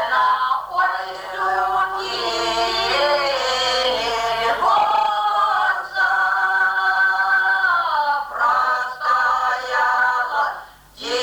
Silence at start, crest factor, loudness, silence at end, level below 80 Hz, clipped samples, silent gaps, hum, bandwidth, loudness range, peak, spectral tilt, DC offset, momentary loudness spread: 0 s; 12 dB; -18 LUFS; 0 s; -52 dBFS; under 0.1%; none; none; over 20 kHz; 2 LU; -6 dBFS; -1 dB/octave; under 0.1%; 5 LU